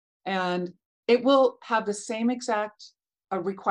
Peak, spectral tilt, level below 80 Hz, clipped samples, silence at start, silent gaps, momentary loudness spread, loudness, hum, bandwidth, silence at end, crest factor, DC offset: -8 dBFS; -4.5 dB/octave; -78 dBFS; under 0.1%; 0.25 s; 0.86-1.03 s; 13 LU; -26 LUFS; none; 11 kHz; 0 s; 18 dB; under 0.1%